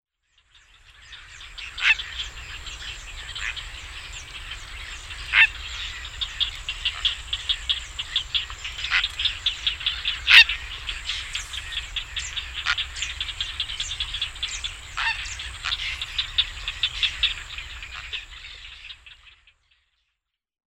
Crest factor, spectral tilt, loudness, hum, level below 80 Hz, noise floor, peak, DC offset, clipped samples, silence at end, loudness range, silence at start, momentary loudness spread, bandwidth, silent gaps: 28 dB; 0.5 dB/octave; -23 LUFS; none; -42 dBFS; -81 dBFS; 0 dBFS; under 0.1%; under 0.1%; 1.35 s; 9 LU; 0.85 s; 16 LU; 16 kHz; none